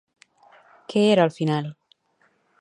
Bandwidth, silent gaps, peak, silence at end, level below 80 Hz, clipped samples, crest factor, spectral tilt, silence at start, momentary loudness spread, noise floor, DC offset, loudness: 11 kHz; none; -4 dBFS; 0.9 s; -74 dBFS; under 0.1%; 20 dB; -6.5 dB/octave; 0.9 s; 10 LU; -66 dBFS; under 0.1%; -21 LUFS